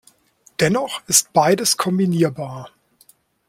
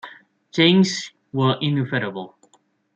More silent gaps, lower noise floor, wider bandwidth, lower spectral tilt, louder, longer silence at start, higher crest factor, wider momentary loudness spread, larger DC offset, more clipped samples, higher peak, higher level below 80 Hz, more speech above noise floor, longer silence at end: neither; second, -56 dBFS vs -61 dBFS; first, 16.5 kHz vs 8.4 kHz; second, -3.5 dB/octave vs -5.5 dB/octave; first, -17 LUFS vs -20 LUFS; first, 0.6 s vs 0.05 s; about the same, 20 dB vs 18 dB; second, 16 LU vs 19 LU; neither; neither; first, 0 dBFS vs -4 dBFS; first, -60 dBFS vs -66 dBFS; second, 38 dB vs 42 dB; about the same, 0.8 s vs 0.7 s